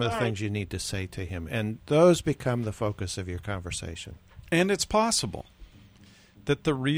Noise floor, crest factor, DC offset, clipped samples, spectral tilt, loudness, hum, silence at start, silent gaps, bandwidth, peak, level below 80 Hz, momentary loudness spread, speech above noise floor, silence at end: -55 dBFS; 20 dB; under 0.1%; under 0.1%; -5 dB/octave; -27 LUFS; none; 0 s; none; over 20 kHz; -8 dBFS; -50 dBFS; 14 LU; 28 dB; 0 s